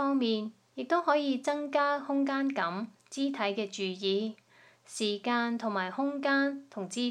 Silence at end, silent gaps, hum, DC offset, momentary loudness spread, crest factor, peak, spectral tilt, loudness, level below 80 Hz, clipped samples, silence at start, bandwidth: 0 s; none; none; under 0.1%; 11 LU; 18 dB; -14 dBFS; -4 dB/octave; -31 LUFS; -90 dBFS; under 0.1%; 0 s; 11.5 kHz